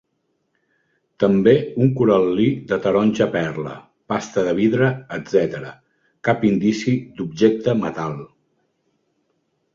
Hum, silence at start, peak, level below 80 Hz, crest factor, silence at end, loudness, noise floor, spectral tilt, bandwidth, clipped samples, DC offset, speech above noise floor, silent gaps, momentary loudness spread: none; 1.2 s; -2 dBFS; -56 dBFS; 18 dB; 1.5 s; -19 LUFS; -71 dBFS; -7 dB/octave; 7.6 kHz; under 0.1%; under 0.1%; 52 dB; none; 13 LU